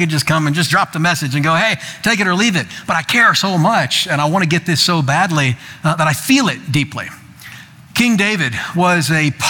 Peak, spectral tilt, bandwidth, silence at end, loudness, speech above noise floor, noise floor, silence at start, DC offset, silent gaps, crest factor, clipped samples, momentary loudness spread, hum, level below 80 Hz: -2 dBFS; -4 dB/octave; 19 kHz; 0 s; -14 LUFS; 22 dB; -37 dBFS; 0 s; under 0.1%; none; 14 dB; under 0.1%; 6 LU; none; -52 dBFS